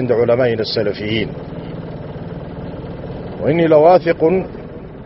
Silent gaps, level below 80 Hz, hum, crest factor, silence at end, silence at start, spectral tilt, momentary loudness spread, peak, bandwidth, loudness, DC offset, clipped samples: none; -40 dBFS; none; 16 dB; 0 s; 0 s; -5 dB/octave; 18 LU; 0 dBFS; 6 kHz; -15 LUFS; under 0.1%; under 0.1%